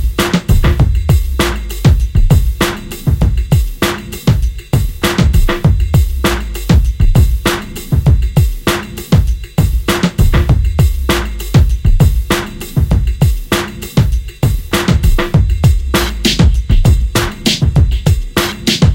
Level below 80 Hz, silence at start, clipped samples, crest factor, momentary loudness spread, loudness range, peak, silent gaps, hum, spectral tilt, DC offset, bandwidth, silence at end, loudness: -14 dBFS; 0 s; under 0.1%; 12 dB; 5 LU; 2 LU; 0 dBFS; none; none; -5.5 dB/octave; under 0.1%; 17 kHz; 0 s; -13 LUFS